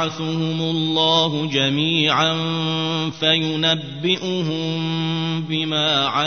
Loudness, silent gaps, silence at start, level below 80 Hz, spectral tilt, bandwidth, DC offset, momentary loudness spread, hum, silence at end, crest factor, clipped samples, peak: -19 LUFS; none; 0 s; -62 dBFS; -5 dB/octave; 6.6 kHz; 0.3%; 6 LU; none; 0 s; 18 dB; under 0.1%; -2 dBFS